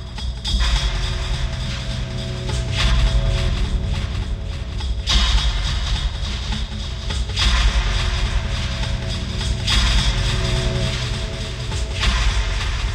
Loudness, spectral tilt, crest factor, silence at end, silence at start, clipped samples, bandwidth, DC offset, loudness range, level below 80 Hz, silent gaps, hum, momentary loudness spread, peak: -22 LUFS; -4 dB/octave; 16 dB; 0 s; 0 s; under 0.1%; 10.5 kHz; under 0.1%; 2 LU; -22 dBFS; none; none; 8 LU; -4 dBFS